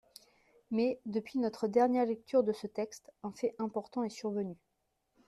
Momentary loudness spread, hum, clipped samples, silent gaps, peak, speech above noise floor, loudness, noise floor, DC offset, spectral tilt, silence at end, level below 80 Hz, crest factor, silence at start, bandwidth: 10 LU; none; under 0.1%; none; -16 dBFS; 47 dB; -34 LUFS; -81 dBFS; under 0.1%; -6.5 dB/octave; 0.75 s; -76 dBFS; 18 dB; 0.7 s; 13 kHz